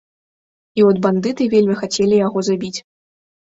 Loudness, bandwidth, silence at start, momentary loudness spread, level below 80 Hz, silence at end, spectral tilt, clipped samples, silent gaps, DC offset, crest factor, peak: -16 LUFS; 8 kHz; 0.75 s; 11 LU; -58 dBFS; 0.7 s; -5.5 dB/octave; under 0.1%; none; under 0.1%; 16 dB; -2 dBFS